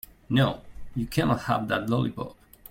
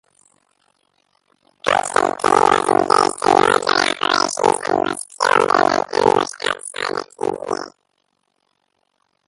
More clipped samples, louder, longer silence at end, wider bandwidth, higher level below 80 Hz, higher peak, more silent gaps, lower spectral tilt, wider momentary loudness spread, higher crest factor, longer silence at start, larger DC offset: neither; second, -27 LUFS vs -17 LUFS; second, 0.4 s vs 1.6 s; first, 16.5 kHz vs 11.5 kHz; first, -48 dBFS vs -58 dBFS; second, -8 dBFS vs 0 dBFS; neither; first, -6.5 dB/octave vs -2.5 dB/octave; first, 14 LU vs 10 LU; about the same, 18 dB vs 20 dB; second, 0.3 s vs 1.65 s; neither